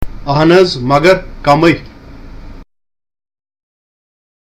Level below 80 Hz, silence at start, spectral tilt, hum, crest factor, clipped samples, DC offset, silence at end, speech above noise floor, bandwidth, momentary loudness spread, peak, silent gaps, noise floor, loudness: -32 dBFS; 0 s; -6.5 dB/octave; none; 14 dB; 0.2%; under 0.1%; 1.9 s; 22 dB; 15 kHz; 6 LU; 0 dBFS; none; -32 dBFS; -10 LUFS